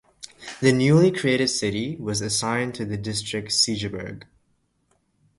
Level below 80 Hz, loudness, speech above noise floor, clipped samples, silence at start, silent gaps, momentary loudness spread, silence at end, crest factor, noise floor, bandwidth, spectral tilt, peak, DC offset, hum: -54 dBFS; -22 LUFS; 46 dB; under 0.1%; 0.2 s; none; 19 LU; 1.15 s; 20 dB; -68 dBFS; 11.5 kHz; -4.5 dB/octave; -4 dBFS; under 0.1%; none